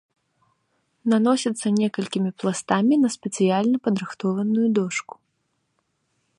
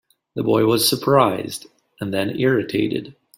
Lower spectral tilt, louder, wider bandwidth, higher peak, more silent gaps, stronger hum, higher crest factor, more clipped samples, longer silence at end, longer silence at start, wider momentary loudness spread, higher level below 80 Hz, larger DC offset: about the same, -5.5 dB/octave vs -4.5 dB/octave; second, -22 LUFS vs -19 LUFS; second, 11 kHz vs 16.5 kHz; about the same, -4 dBFS vs -2 dBFS; neither; neither; about the same, 20 dB vs 18 dB; neither; first, 1.4 s vs 0.25 s; first, 1.05 s vs 0.35 s; second, 7 LU vs 15 LU; second, -70 dBFS vs -58 dBFS; neither